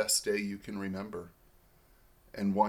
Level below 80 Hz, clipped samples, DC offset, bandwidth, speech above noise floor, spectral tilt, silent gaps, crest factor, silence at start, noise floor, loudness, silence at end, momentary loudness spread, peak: -64 dBFS; under 0.1%; under 0.1%; 18.5 kHz; 30 dB; -3.5 dB/octave; none; 22 dB; 0 s; -63 dBFS; -35 LUFS; 0 s; 18 LU; -14 dBFS